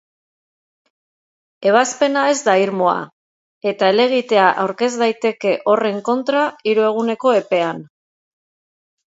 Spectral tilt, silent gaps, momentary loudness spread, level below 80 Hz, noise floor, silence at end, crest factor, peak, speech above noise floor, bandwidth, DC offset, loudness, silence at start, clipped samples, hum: -4 dB/octave; 3.13-3.61 s; 7 LU; -72 dBFS; under -90 dBFS; 1.35 s; 18 dB; 0 dBFS; over 74 dB; 8 kHz; under 0.1%; -17 LUFS; 1.6 s; under 0.1%; none